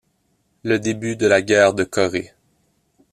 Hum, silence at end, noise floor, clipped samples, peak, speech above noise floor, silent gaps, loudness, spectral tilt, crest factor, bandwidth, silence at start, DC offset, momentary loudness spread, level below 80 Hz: none; 0.85 s; -66 dBFS; under 0.1%; -2 dBFS; 48 dB; none; -18 LUFS; -4.5 dB/octave; 18 dB; 14 kHz; 0.65 s; under 0.1%; 13 LU; -56 dBFS